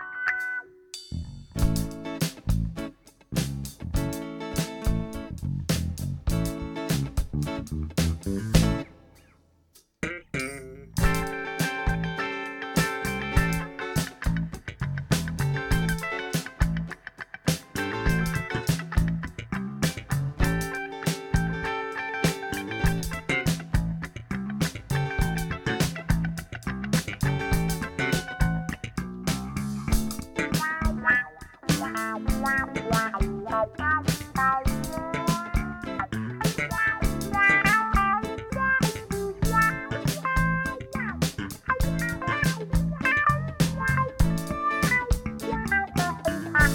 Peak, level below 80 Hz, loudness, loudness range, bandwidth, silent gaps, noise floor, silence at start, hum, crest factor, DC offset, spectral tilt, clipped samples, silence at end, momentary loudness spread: -6 dBFS; -34 dBFS; -27 LUFS; 6 LU; 18.5 kHz; none; -61 dBFS; 0 s; none; 22 dB; under 0.1%; -5 dB/octave; under 0.1%; 0 s; 10 LU